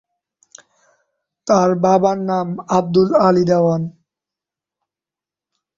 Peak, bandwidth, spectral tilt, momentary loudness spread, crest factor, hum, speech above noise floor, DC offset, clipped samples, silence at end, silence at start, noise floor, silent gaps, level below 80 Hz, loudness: -2 dBFS; 7.6 kHz; -7 dB/octave; 9 LU; 16 dB; none; 74 dB; under 0.1%; under 0.1%; 1.85 s; 1.45 s; -89 dBFS; none; -58 dBFS; -16 LUFS